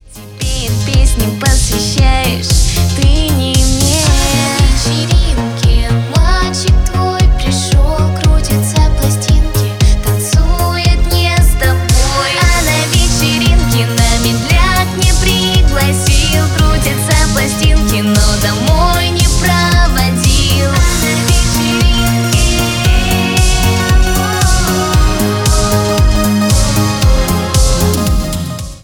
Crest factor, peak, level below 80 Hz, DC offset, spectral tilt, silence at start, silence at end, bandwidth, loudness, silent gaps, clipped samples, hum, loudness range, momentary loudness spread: 10 dB; 0 dBFS; -14 dBFS; under 0.1%; -4 dB/octave; 0.1 s; 0.05 s; 18.5 kHz; -11 LUFS; none; under 0.1%; none; 1 LU; 3 LU